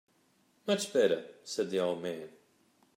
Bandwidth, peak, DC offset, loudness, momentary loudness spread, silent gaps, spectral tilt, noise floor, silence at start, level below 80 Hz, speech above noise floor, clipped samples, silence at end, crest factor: 16 kHz; -14 dBFS; under 0.1%; -32 LUFS; 14 LU; none; -4 dB/octave; -70 dBFS; 0.65 s; -86 dBFS; 38 dB; under 0.1%; 0.7 s; 20 dB